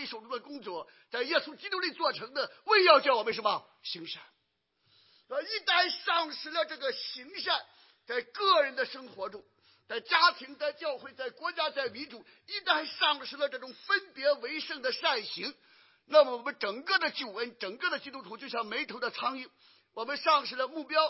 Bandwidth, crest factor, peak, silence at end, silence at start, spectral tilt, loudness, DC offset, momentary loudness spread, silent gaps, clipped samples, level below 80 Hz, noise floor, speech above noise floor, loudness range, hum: 5.8 kHz; 24 dB; -8 dBFS; 0 s; 0 s; -5 dB/octave; -30 LUFS; under 0.1%; 16 LU; none; under 0.1%; -88 dBFS; -78 dBFS; 47 dB; 5 LU; none